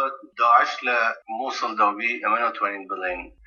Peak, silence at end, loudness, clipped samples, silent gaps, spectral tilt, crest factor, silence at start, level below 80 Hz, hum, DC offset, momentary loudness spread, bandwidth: -4 dBFS; 0.15 s; -22 LUFS; under 0.1%; none; -2.5 dB/octave; 20 dB; 0 s; -60 dBFS; none; under 0.1%; 11 LU; 7 kHz